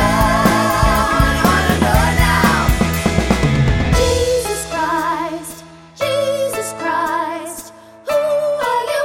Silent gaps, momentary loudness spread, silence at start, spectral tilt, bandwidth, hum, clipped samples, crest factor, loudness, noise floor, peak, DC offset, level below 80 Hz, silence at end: none; 10 LU; 0 s; -5 dB/octave; 17 kHz; none; under 0.1%; 14 dB; -16 LUFS; -37 dBFS; 0 dBFS; under 0.1%; -24 dBFS; 0 s